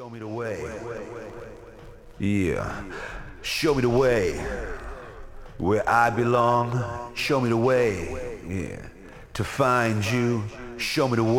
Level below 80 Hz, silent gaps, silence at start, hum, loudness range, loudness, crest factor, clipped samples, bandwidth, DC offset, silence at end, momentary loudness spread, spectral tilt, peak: -44 dBFS; none; 0 s; none; 5 LU; -25 LUFS; 18 dB; under 0.1%; 17 kHz; under 0.1%; 0 s; 18 LU; -6 dB/octave; -6 dBFS